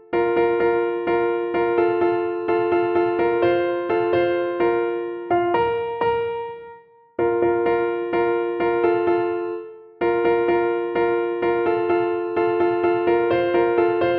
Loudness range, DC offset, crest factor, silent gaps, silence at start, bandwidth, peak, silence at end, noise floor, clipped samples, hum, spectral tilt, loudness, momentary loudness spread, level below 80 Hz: 2 LU; under 0.1%; 14 dB; none; 0.1 s; 4.6 kHz; -6 dBFS; 0 s; -46 dBFS; under 0.1%; none; -9 dB/octave; -21 LUFS; 5 LU; -54 dBFS